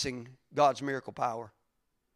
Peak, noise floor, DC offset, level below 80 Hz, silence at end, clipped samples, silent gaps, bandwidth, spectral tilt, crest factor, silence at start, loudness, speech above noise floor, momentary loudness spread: -12 dBFS; -78 dBFS; under 0.1%; -66 dBFS; 0.7 s; under 0.1%; none; 14.5 kHz; -4.5 dB/octave; 20 dB; 0 s; -31 LUFS; 47 dB; 16 LU